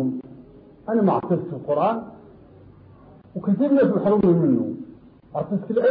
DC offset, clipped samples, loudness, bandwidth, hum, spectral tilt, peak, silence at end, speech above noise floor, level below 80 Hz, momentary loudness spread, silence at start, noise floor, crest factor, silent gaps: under 0.1%; under 0.1%; -22 LUFS; 4.8 kHz; none; -12.5 dB/octave; -8 dBFS; 0 s; 28 dB; -58 dBFS; 18 LU; 0 s; -48 dBFS; 14 dB; none